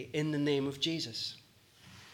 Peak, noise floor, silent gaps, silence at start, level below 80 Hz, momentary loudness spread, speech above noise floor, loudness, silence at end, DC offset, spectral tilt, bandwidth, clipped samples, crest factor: -18 dBFS; -60 dBFS; none; 0 s; -74 dBFS; 16 LU; 26 dB; -34 LUFS; 0 s; under 0.1%; -5 dB/octave; 18 kHz; under 0.1%; 18 dB